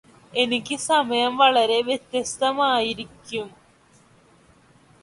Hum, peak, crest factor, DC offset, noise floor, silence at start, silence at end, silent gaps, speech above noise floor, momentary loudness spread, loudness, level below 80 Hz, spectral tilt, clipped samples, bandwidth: none; -4 dBFS; 20 dB; under 0.1%; -56 dBFS; 0.35 s; 1.55 s; none; 34 dB; 15 LU; -22 LUFS; -62 dBFS; -2 dB/octave; under 0.1%; 11.5 kHz